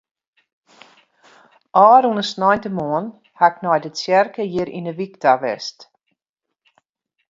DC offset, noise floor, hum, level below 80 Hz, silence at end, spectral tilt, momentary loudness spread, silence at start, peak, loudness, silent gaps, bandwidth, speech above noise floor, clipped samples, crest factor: under 0.1%; -82 dBFS; none; -64 dBFS; 1.45 s; -5 dB/octave; 15 LU; 1.75 s; 0 dBFS; -18 LUFS; none; 7.8 kHz; 64 dB; under 0.1%; 20 dB